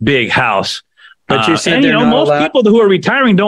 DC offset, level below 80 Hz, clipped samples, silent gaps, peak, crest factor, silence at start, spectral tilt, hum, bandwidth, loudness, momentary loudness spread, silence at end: under 0.1%; -46 dBFS; under 0.1%; none; 0 dBFS; 10 dB; 0 s; -5 dB/octave; none; 12 kHz; -11 LUFS; 7 LU; 0 s